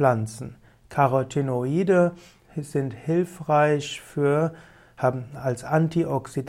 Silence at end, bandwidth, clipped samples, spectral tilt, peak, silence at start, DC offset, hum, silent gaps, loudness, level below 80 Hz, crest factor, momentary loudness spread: 0 s; 15 kHz; under 0.1%; -7 dB/octave; -6 dBFS; 0 s; under 0.1%; none; none; -24 LUFS; -58 dBFS; 18 dB; 11 LU